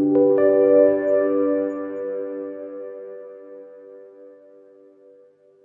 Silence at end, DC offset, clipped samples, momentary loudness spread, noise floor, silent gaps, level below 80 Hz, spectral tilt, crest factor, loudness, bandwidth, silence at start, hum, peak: 1.35 s; under 0.1%; under 0.1%; 25 LU; -53 dBFS; none; -68 dBFS; -10.5 dB/octave; 18 dB; -19 LUFS; 3.1 kHz; 0 s; none; -4 dBFS